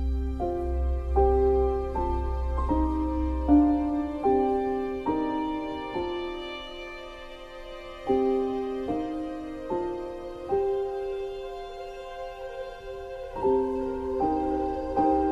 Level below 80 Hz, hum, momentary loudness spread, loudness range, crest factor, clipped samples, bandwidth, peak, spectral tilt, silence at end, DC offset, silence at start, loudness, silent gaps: -34 dBFS; none; 15 LU; 7 LU; 18 dB; under 0.1%; 7.4 kHz; -10 dBFS; -8.5 dB/octave; 0 s; under 0.1%; 0 s; -28 LUFS; none